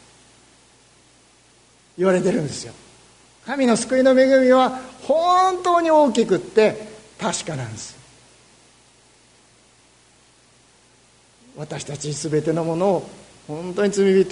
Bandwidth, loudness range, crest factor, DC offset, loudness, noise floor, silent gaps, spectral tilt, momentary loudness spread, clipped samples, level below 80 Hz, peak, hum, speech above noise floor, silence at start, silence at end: 11 kHz; 15 LU; 18 dB; under 0.1%; -19 LUFS; -55 dBFS; none; -5 dB/octave; 19 LU; under 0.1%; -60 dBFS; -2 dBFS; none; 36 dB; 2 s; 0 s